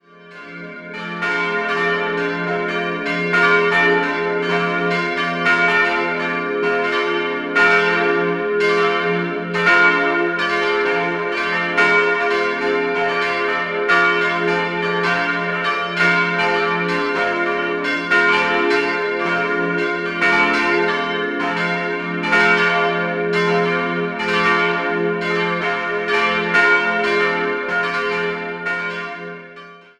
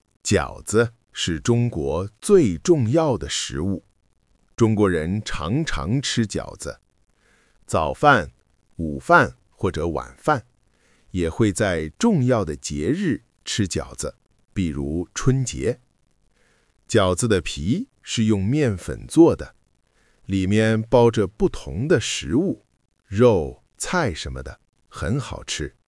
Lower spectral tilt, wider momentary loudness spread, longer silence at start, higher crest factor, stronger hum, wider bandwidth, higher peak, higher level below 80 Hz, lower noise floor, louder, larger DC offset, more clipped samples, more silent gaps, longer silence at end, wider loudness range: about the same, -5 dB/octave vs -5.5 dB/octave; second, 7 LU vs 14 LU; about the same, 0.2 s vs 0.25 s; about the same, 18 dB vs 22 dB; neither; about the same, 11 kHz vs 12 kHz; about the same, -2 dBFS vs 0 dBFS; second, -56 dBFS vs -42 dBFS; second, -40 dBFS vs -64 dBFS; first, -17 LUFS vs -22 LUFS; neither; neither; neither; about the same, 0.2 s vs 0.2 s; about the same, 2 LU vs 4 LU